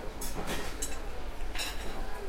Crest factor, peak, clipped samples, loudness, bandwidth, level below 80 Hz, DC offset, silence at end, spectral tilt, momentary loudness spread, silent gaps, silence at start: 14 dB; -20 dBFS; under 0.1%; -38 LUFS; 16.5 kHz; -38 dBFS; under 0.1%; 0 s; -3 dB/octave; 6 LU; none; 0 s